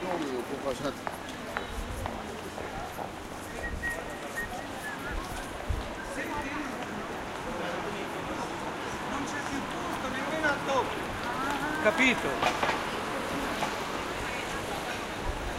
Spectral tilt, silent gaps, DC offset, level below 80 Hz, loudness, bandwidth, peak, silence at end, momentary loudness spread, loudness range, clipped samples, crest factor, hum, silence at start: -4 dB/octave; none; under 0.1%; -46 dBFS; -32 LUFS; 16 kHz; -10 dBFS; 0 s; 10 LU; 8 LU; under 0.1%; 24 dB; none; 0 s